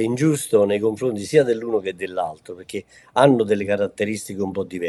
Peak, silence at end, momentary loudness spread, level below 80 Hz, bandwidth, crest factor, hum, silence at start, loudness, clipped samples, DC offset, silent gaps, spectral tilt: -2 dBFS; 0 s; 14 LU; -64 dBFS; 13 kHz; 20 dB; none; 0 s; -21 LUFS; under 0.1%; under 0.1%; none; -5.5 dB/octave